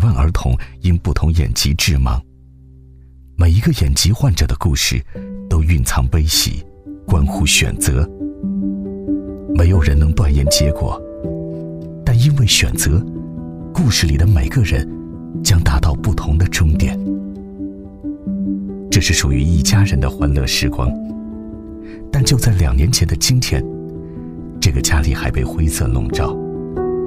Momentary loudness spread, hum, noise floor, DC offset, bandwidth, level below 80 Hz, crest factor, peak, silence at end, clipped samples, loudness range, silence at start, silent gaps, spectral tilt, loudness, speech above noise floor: 15 LU; none; -42 dBFS; under 0.1%; 16 kHz; -22 dBFS; 16 dB; 0 dBFS; 0 s; under 0.1%; 2 LU; 0 s; none; -4.5 dB/octave; -16 LUFS; 28 dB